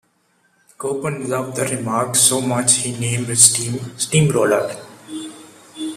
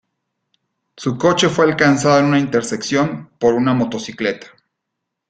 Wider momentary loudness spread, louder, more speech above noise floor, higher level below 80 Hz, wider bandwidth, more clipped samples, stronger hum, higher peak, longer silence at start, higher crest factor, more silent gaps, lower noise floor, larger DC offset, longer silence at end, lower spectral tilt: first, 20 LU vs 9 LU; about the same, -16 LUFS vs -16 LUFS; second, 44 dB vs 62 dB; about the same, -56 dBFS vs -56 dBFS; first, 15.5 kHz vs 9.4 kHz; neither; neither; about the same, 0 dBFS vs 0 dBFS; second, 0.8 s vs 0.95 s; about the same, 20 dB vs 18 dB; neither; second, -62 dBFS vs -78 dBFS; neither; second, 0 s vs 0.85 s; second, -3 dB/octave vs -5 dB/octave